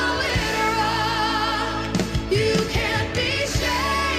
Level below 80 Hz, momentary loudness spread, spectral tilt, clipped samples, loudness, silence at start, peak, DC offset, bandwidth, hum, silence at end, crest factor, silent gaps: -34 dBFS; 3 LU; -4 dB/octave; under 0.1%; -22 LUFS; 0 s; -6 dBFS; under 0.1%; 15.5 kHz; none; 0 s; 16 dB; none